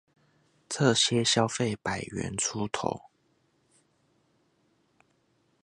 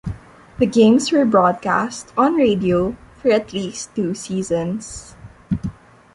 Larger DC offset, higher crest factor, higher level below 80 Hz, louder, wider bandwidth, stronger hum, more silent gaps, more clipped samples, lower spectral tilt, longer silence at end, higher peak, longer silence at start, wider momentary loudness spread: neither; first, 24 dB vs 16 dB; second, -62 dBFS vs -44 dBFS; second, -27 LUFS vs -18 LUFS; about the same, 11.5 kHz vs 11.5 kHz; neither; neither; neither; second, -3.5 dB/octave vs -5.5 dB/octave; first, 2.65 s vs 0.4 s; second, -8 dBFS vs -2 dBFS; first, 0.7 s vs 0.05 s; second, 11 LU vs 14 LU